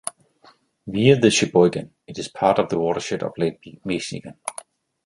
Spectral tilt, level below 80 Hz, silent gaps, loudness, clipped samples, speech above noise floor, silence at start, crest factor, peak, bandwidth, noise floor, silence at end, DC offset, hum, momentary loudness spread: -5 dB/octave; -56 dBFS; none; -20 LUFS; under 0.1%; 35 dB; 0.05 s; 20 dB; -2 dBFS; 11.5 kHz; -55 dBFS; 0.55 s; under 0.1%; none; 17 LU